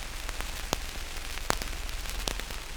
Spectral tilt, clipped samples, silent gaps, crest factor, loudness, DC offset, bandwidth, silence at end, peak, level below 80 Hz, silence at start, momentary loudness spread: -2.5 dB/octave; under 0.1%; none; 32 dB; -35 LUFS; under 0.1%; over 20 kHz; 0 s; -2 dBFS; -38 dBFS; 0 s; 5 LU